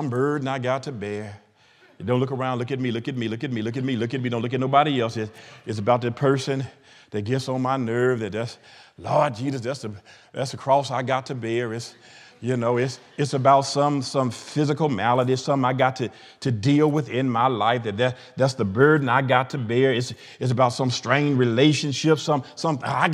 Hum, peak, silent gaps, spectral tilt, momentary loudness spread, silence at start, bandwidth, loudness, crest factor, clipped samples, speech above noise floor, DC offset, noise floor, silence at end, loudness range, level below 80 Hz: none; -2 dBFS; none; -6 dB/octave; 12 LU; 0 s; 11.5 kHz; -23 LUFS; 22 dB; under 0.1%; 33 dB; under 0.1%; -56 dBFS; 0 s; 5 LU; -72 dBFS